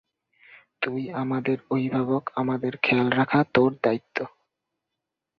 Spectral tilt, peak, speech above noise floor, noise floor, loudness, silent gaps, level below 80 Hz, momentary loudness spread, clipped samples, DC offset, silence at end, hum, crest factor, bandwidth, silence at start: -8.5 dB/octave; -4 dBFS; 60 dB; -84 dBFS; -25 LUFS; none; -64 dBFS; 9 LU; under 0.1%; under 0.1%; 1.1 s; none; 22 dB; 6 kHz; 0.8 s